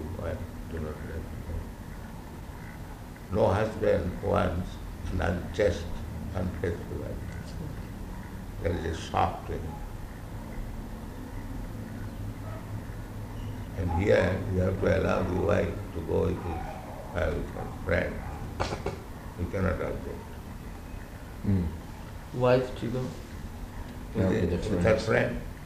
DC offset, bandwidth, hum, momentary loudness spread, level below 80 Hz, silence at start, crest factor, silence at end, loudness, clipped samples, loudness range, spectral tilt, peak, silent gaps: under 0.1%; 15 kHz; none; 16 LU; -42 dBFS; 0 s; 20 dB; 0 s; -31 LUFS; under 0.1%; 9 LU; -7 dB/octave; -10 dBFS; none